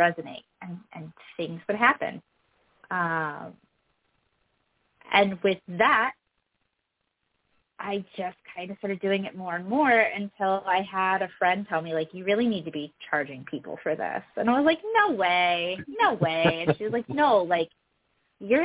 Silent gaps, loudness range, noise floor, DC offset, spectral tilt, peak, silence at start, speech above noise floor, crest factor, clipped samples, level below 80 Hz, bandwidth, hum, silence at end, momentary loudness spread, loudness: none; 6 LU; -79 dBFS; under 0.1%; -9 dB/octave; -6 dBFS; 0 s; 53 dB; 22 dB; under 0.1%; -66 dBFS; 4 kHz; none; 0 s; 17 LU; -26 LUFS